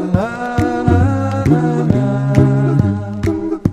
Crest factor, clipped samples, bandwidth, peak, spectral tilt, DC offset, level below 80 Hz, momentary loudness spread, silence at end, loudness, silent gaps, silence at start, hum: 14 dB; 0.2%; 9.4 kHz; 0 dBFS; -9 dB/octave; under 0.1%; -32 dBFS; 6 LU; 0 s; -15 LUFS; none; 0 s; none